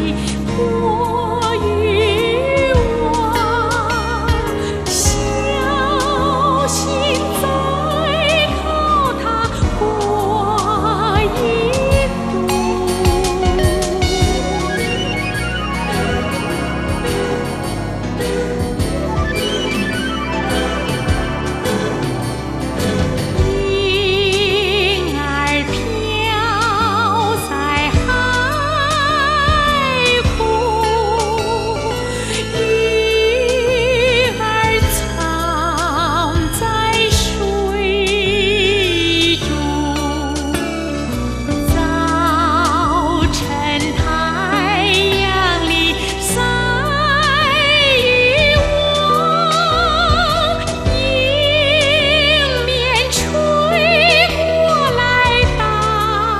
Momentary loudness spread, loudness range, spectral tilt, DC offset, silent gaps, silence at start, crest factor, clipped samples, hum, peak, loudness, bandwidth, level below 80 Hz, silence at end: 7 LU; 6 LU; -4 dB/octave; under 0.1%; none; 0 s; 16 dB; under 0.1%; none; 0 dBFS; -15 LUFS; 14 kHz; -26 dBFS; 0 s